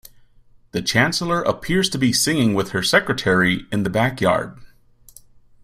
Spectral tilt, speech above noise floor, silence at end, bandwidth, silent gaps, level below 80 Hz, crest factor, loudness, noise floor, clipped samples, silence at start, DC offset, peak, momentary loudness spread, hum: -4 dB/octave; 32 dB; 0.95 s; 16 kHz; none; -48 dBFS; 20 dB; -19 LUFS; -51 dBFS; under 0.1%; 0.75 s; under 0.1%; -2 dBFS; 5 LU; none